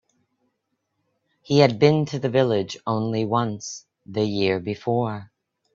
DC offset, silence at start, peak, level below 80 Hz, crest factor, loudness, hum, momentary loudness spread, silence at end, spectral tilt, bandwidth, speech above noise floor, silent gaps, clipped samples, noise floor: under 0.1%; 1.5 s; -2 dBFS; -62 dBFS; 22 dB; -22 LUFS; none; 14 LU; 0.5 s; -6 dB/octave; 7.6 kHz; 55 dB; none; under 0.1%; -76 dBFS